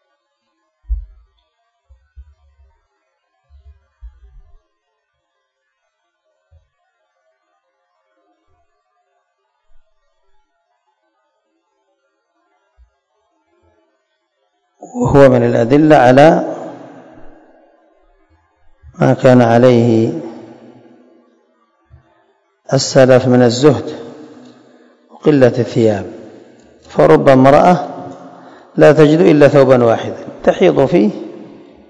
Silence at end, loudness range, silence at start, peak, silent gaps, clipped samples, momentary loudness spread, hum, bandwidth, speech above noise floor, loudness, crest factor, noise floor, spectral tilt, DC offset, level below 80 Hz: 0.45 s; 6 LU; 0.9 s; 0 dBFS; none; 0.9%; 23 LU; none; 11 kHz; 60 dB; -10 LUFS; 14 dB; -69 dBFS; -7 dB/octave; under 0.1%; -40 dBFS